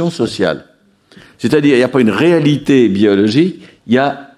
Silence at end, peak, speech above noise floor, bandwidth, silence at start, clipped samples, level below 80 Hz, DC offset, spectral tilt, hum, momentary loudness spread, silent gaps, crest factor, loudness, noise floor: 0.15 s; 0 dBFS; 34 dB; 12 kHz; 0 s; under 0.1%; -52 dBFS; under 0.1%; -6.5 dB/octave; none; 7 LU; none; 12 dB; -12 LUFS; -46 dBFS